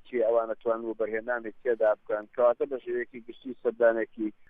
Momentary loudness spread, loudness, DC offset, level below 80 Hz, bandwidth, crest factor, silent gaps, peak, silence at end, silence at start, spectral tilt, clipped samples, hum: 9 LU; -29 LUFS; under 0.1%; -68 dBFS; 3.8 kHz; 18 dB; none; -10 dBFS; 0.2 s; 0.05 s; -8.5 dB/octave; under 0.1%; none